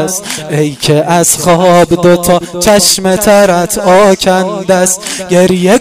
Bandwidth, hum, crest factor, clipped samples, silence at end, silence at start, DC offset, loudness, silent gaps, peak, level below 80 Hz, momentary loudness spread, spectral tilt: 16.5 kHz; none; 8 dB; 1%; 0 s; 0 s; 0.6%; -8 LUFS; none; 0 dBFS; -36 dBFS; 6 LU; -4 dB/octave